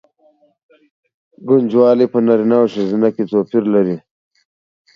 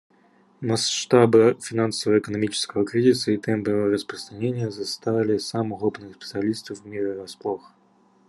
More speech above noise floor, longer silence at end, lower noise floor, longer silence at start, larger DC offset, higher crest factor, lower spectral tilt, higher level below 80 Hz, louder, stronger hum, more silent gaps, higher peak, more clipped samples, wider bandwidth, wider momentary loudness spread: first, 41 dB vs 37 dB; first, 0.95 s vs 0.7 s; second, -55 dBFS vs -59 dBFS; first, 1.4 s vs 0.6 s; neither; second, 16 dB vs 22 dB; first, -9 dB/octave vs -5 dB/octave; first, -64 dBFS vs -70 dBFS; first, -14 LUFS vs -23 LUFS; neither; neither; about the same, 0 dBFS vs -2 dBFS; neither; second, 6.6 kHz vs 12.5 kHz; second, 7 LU vs 13 LU